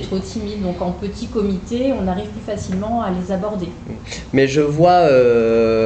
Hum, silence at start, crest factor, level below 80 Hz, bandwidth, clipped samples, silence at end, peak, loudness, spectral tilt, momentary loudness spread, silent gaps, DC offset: none; 0 s; 14 dB; -38 dBFS; 8.8 kHz; under 0.1%; 0 s; -2 dBFS; -18 LUFS; -6.5 dB/octave; 14 LU; none; under 0.1%